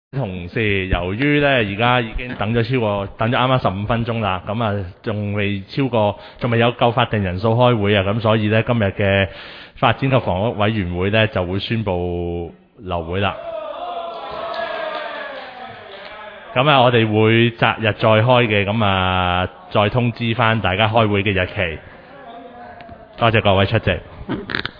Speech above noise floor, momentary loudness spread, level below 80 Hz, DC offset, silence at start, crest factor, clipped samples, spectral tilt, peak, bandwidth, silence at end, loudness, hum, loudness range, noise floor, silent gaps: 21 dB; 14 LU; -40 dBFS; under 0.1%; 0.15 s; 18 dB; under 0.1%; -9.5 dB/octave; 0 dBFS; 5.2 kHz; 0.05 s; -18 LUFS; none; 8 LU; -38 dBFS; none